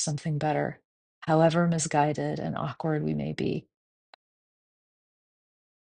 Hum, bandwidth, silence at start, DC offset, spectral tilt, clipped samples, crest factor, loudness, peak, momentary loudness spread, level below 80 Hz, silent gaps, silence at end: none; 10 kHz; 0 s; under 0.1%; -5.5 dB/octave; under 0.1%; 20 dB; -28 LUFS; -10 dBFS; 9 LU; -62 dBFS; 0.85-1.22 s; 2.25 s